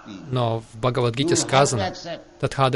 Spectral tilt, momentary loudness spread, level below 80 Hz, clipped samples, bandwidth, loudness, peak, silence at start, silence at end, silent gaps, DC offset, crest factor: -4.5 dB/octave; 10 LU; -50 dBFS; under 0.1%; 11.5 kHz; -22 LUFS; -4 dBFS; 0.05 s; 0 s; none; under 0.1%; 18 dB